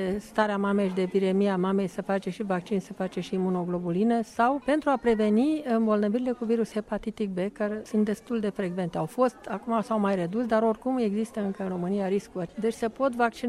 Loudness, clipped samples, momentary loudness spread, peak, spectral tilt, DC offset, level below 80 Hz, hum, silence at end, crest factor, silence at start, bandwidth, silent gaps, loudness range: -27 LUFS; under 0.1%; 6 LU; -8 dBFS; -7 dB/octave; under 0.1%; -60 dBFS; none; 0 s; 18 dB; 0 s; 12.5 kHz; none; 3 LU